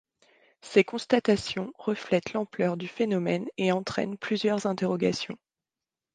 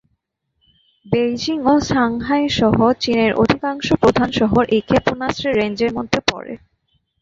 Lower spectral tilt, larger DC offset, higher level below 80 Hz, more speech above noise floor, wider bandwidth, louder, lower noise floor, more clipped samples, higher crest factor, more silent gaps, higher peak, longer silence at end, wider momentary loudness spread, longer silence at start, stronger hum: about the same, -5.5 dB/octave vs -5.5 dB/octave; neither; second, -66 dBFS vs -42 dBFS; first, over 63 dB vs 54 dB; first, 9.6 kHz vs 7.8 kHz; second, -28 LUFS vs -17 LUFS; first, under -90 dBFS vs -71 dBFS; neither; first, 22 dB vs 16 dB; neither; second, -8 dBFS vs -2 dBFS; first, 0.8 s vs 0.65 s; about the same, 8 LU vs 6 LU; second, 0.65 s vs 1.05 s; neither